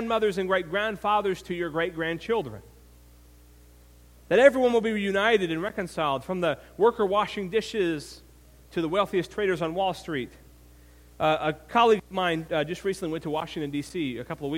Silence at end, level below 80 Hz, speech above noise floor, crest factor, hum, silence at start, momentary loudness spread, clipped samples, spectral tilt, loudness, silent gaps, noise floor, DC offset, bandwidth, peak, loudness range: 0 s; -54 dBFS; 27 dB; 24 dB; 60 Hz at -55 dBFS; 0 s; 10 LU; under 0.1%; -5.5 dB/octave; -26 LUFS; none; -53 dBFS; under 0.1%; 16.5 kHz; -4 dBFS; 5 LU